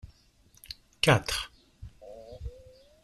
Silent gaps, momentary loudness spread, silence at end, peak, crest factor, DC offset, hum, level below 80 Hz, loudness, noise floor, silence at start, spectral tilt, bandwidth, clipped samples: none; 25 LU; 0.55 s; -8 dBFS; 26 dB; under 0.1%; none; -50 dBFS; -26 LUFS; -62 dBFS; 0.05 s; -4 dB/octave; 14 kHz; under 0.1%